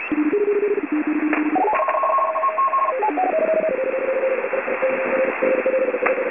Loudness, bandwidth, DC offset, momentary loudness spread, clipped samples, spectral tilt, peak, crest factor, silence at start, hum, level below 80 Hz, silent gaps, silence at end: -20 LUFS; 3.6 kHz; 0.2%; 3 LU; under 0.1%; -9 dB/octave; -4 dBFS; 14 dB; 0 s; none; -66 dBFS; none; 0 s